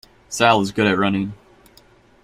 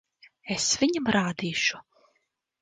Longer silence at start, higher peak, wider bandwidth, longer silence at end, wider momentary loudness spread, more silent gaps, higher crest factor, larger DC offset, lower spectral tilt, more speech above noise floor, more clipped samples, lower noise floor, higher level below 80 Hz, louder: second, 0.3 s vs 0.45 s; first, -2 dBFS vs -8 dBFS; first, 15 kHz vs 10.5 kHz; about the same, 0.9 s vs 0.8 s; about the same, 13 LU vs 14 LU; neither; about the same, 20 dB vs 20 dB; neither; first, -4.5 dB/octave vs -3 dB/octave; second, 34 dB vs 49 dB; neither; second, -52 dBFS vs -75 dBFS; first, -54 dBFS vs -62 dBFS; first, -18 LUFS vs -26 LUFS